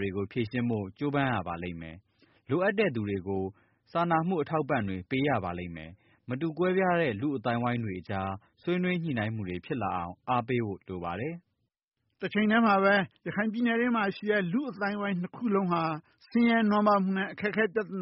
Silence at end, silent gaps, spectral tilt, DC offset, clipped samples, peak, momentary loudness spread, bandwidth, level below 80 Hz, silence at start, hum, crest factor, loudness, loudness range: 0 s; 11.83-11.88 s; -5 dB/octave; under 0.1%; under 0.1%; -12 dBFS; 12 LU; 5.8 kHz; -64 dBFS; 0 s; none; 18 dB; -29 LUFS; 5 LU